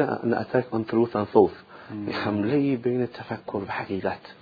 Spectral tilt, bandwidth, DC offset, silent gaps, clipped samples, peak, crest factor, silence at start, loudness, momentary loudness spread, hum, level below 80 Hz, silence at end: -9.5 dB/octave; 5 kHz; under 0.1%; none; under 0.1%; -4 dBFS; 20 dB; 0 s; -26 LUFS; 11 LU; none; -62 dBFS; 0.1 s